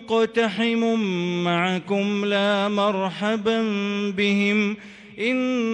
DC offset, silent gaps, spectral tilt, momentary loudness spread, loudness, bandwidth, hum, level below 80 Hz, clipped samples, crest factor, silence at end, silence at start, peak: under 0.1%; none; -5.5 dB/octave; 4 LU; -22 LUFS; 9.2 kHz; none; -66 dBFS; under 0.1%; 12 dB; 0 s; 0 s; -10 dBFS